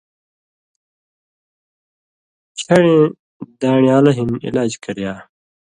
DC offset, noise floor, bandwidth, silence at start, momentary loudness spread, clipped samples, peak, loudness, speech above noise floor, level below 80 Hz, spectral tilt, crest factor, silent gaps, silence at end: under 0.1%; under -90 dBFS; 11 kHz; 2.55 s; 18 LU; under 0.1%; 0 dBFS; -15 LUFS; over 75 dB; -54 dBFS; -6.5 dB/octave; 18 dB; 3.19-3.40 s; 0.55 s